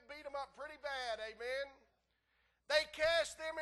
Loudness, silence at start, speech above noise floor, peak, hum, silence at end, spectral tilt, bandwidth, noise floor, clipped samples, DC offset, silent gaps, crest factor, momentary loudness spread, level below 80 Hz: -39 LUFS; 0.1 s; 41 dB; -18 dBFS; none; 0 s; -1 dB/octave; 12.5 kHz; -80 dBFS; under 0.1%; under 0.1%; none; 22 dB; 13 LU; -68 dBFS